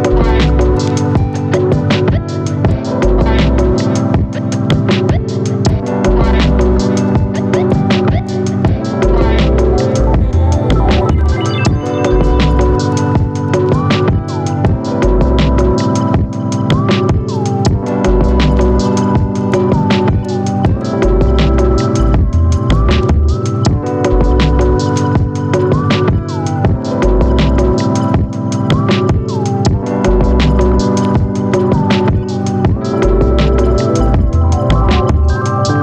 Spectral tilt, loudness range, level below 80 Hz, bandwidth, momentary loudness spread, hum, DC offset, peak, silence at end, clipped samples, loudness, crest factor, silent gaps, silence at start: -7 dB/octave; 1 LU; -16 dBFS; 9 kHz; 3 LU; none; under 0.1%; 0 dBFS; 0 s; under 0.1%; -13 LUFS; 10 dB; none; 0 s